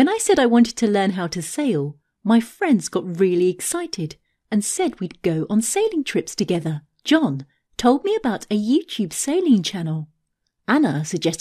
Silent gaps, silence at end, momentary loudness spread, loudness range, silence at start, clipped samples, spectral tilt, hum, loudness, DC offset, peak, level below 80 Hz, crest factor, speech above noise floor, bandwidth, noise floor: none; 0.05 s; 11 LU; 2 LU; 0 s; under 0.1%; -5 dB/octave; none; -21 LUFS; under 0.1%; -4 dBFS; -56 dBFS; 18 dB; 53 dB; 14 kHz; -73 dBFS